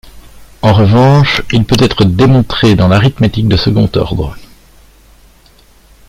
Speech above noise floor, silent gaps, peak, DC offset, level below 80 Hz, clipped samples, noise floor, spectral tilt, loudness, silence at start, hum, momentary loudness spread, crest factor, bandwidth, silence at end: 35 dB; none; 0 dBFS; under 0.1%; -30 dBFS; under 0.1%; -43 dBFS; -7 dB/octave; -9 LUFS; 0.05 s; none; 8 LU; 10 dB; 15.5 kHz; 1.7 s